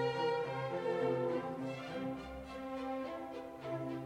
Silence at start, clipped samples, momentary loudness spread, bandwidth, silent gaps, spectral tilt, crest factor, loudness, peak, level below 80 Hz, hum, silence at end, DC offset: 0 s; under 0.1%; 11 LU; 14 kHz; none; -6.5 dB/octave; 14 dB; -39 LUFS; -24 dBFS; -64 dBFS; none; 0 s; under 0.1%